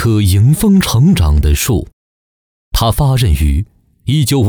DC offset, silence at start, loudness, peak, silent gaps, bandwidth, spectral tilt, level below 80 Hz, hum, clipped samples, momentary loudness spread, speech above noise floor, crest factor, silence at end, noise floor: under 0.1%; 0 s; -12 LUFS; -2 dBFS; 1.93-2.72 s; over 20 kHz; -6 dB/octave; -20 dBFS; none; under 0.1%; 9 LU; over 80 dB; 8 dB; 0 s; under -90 dBFS